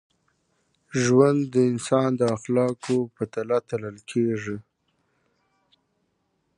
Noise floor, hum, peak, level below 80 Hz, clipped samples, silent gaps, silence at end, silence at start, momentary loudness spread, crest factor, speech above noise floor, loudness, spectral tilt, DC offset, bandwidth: -73 dBFS; none; -4 dBFS; -64 dBFS; under 0.1%; none; 1.95 s; 0.95 s; 12 LU; 20 dB; 50 dB; -24 LUFS; -6.5 dB/octave; under 0.1%; 11 kHz